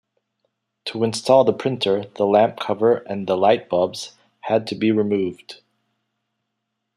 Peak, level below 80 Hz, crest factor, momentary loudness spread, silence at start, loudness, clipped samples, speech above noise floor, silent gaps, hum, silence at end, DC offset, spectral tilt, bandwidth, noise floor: -2 dBFS; -68 dBFS; 20 dB; 15 LU; 0.85 s; -20 LUFS; under 0.1%; 59 dB; none; none; 1.4 s; under 0.1%; -5.5 dB/octave; 13 kHz; -78 dBFS